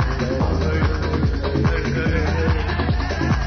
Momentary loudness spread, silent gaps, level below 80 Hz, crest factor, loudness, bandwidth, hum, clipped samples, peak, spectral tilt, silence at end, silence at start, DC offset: 2 LU; none; -24 dBFS; 12 dB; -21 LUFS; 6.6 kHz; none; under 0.1%; -6 dBFS; -7 dB/octave; 0 s; 0 s; 0.6%